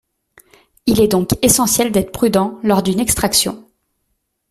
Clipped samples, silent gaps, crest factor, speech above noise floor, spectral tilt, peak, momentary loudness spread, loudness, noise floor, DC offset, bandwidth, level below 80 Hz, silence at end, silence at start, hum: under 0.1%; none; 16 dB; 55 dB; -4 dB/octave; 0 dBFS; 5 LU; -15 LUFS; -70 dBFS; under 0.1%; 16 kHz; -40 dBFS; 0.9 s; 0.85 s; none